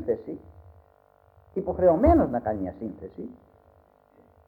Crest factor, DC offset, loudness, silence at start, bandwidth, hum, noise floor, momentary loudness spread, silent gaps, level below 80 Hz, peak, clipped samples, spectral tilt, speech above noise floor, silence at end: 22 dB; under 0.1%; -25 LUFS; 0 s; 4.5 kHz; none; -60 dBFS; 21 LU; none; -40 dBFS; -6 dBFS; under 0.1%; -11.5 dB/octave; 35 dB; 1.15 s